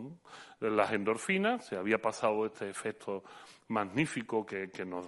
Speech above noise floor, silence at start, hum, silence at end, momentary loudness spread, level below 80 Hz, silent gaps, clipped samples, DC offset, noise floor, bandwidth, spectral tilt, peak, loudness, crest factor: 19 dB; 0 s; none; 0 s; 15 LU; -74 dBFS; none; under 0.1%; under 0.1%; -53 dBFS; 11.5 kHz; -5 dB/octave; -12 dBFS; -34 LUFS; 22 dB